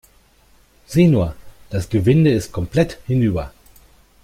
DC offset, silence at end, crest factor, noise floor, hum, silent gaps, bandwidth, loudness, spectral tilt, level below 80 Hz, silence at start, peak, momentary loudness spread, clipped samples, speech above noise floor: under 0.1%; 0.75 s; 16 dB; -53 dBFS; none; none; 15.5 kHz; -18 LUFS; -7.5 dB/octave; -40 dBFS; 0.9 s; -2 dBFS; 12 LU; under 0.1%; 37 dB